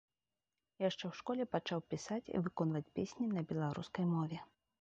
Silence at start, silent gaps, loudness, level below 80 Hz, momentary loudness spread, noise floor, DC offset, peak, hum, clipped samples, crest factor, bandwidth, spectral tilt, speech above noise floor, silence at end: 0.8 s; none; -40 LUFS; -72 dBFS; 5 LU; under -90 dBFS; under 0.1%; -22 dBFS; none; under 0.1%; 18 dB; 8 kHz; -6.5 dB/octave; over 51 dB; 0.35 s